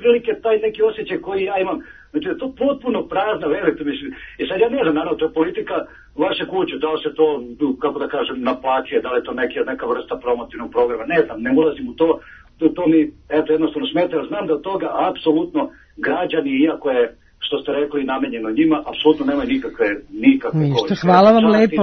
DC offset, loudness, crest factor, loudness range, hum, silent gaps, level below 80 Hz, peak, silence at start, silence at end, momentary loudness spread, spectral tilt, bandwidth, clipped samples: under 0.1%; -19 LUFS; 18 dB; 3 LU; none; none; -50 dBFS; 0 dBFS; 0 s; 0 s; 8 LU; -7.5 dB/octave; 6.4 kHz; under 0.1%